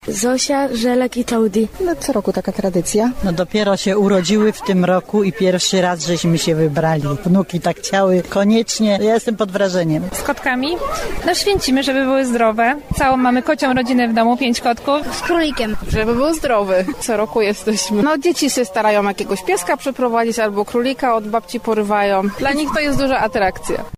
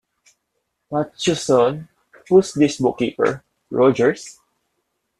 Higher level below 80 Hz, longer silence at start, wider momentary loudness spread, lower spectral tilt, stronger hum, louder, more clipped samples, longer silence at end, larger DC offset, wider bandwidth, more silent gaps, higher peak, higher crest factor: first, -36 dBFS vs -58 dBFS; second, 0.05 s vs 0.9 s; second, 5 LU vs 15 LU; about the same, -4.5 dB/octave vs -5.5 dB/octave; neither; about the same, -17 LUFS vs -19 LUFS; neither; second, 0 s vs 0.9 s; neither; first, 15.5 kHz vs 12 kHz; neither; about the same, -4 dBFS vs -4 dBFS; second, 12 dB vs 18 dB